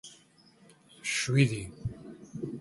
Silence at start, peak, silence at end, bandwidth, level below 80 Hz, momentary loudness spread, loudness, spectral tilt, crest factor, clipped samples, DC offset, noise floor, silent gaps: 0.05 s; -10 dBFS; 0 s; 11.5 kHz; -56 dBFS; 20 LU; -31 LUFS; -5 dB/octave; 24 dB; under 0.1%; under 0.1%; -60 dBFS; none